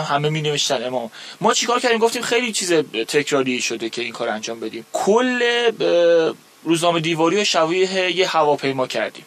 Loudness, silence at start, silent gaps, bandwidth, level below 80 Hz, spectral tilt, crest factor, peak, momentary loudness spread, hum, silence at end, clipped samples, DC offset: -19 LUFS; 0 s; none; 15.5 kHz; -72 dBFS; -3.5 dB/octave; 18 dB; -2 dBFS; 8 LU; none; 0.05 s; under 0.1%; under 0.1%